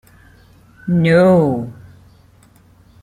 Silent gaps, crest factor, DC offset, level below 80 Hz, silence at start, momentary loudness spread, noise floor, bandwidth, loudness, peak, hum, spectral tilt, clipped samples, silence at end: none; 16 dB; under 0.1%; -50 dBFS; 0.85 s; 20 LU; -49 dBFS; 10 kHz; -14 LUFS; -2 dBFS; none; -8.5 dB/octave; under 0.1%; 1.3 s